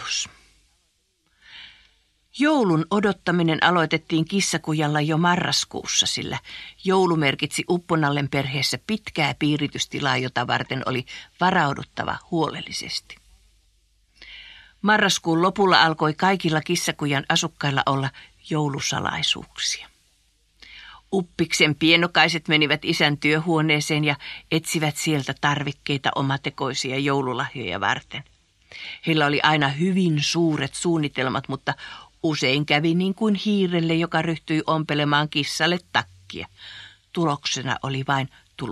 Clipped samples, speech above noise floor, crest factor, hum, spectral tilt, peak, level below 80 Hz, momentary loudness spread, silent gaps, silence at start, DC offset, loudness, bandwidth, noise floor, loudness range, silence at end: under 0.1%; 46 dB; 22 dB; none; -4 dB/octave; 0 dBFS; -58 dBFS; 12 LU; none; 0 s; under 0.1%; -22 LUFS; 13.5 kHz; -68 dBFS; 5 LU; 0 s